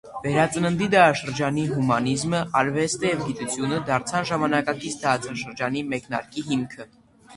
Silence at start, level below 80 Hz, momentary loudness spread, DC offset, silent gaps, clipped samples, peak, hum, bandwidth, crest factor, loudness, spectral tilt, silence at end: 0.05 s; -56 dBFS; 9 LU; under 0.1%; none; under 0.1%; -2 dBFS; none; 11.5 kHz; 22 dB; -23 LUFS; -5 dB/octave; 0 s